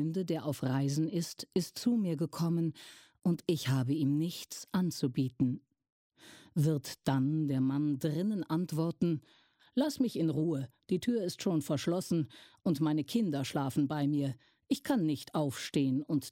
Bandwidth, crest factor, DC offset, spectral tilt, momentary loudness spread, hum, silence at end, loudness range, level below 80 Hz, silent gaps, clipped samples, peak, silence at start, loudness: 16.5 kHz; 16 dB; under 0.1%; -6.5 dB/octave; 6 LU; none; 0 s; 1 LU; -72 dBFS; 5.92-6.10 s; under 0.1%; -16 dBFS; 0 s; -33 LUFS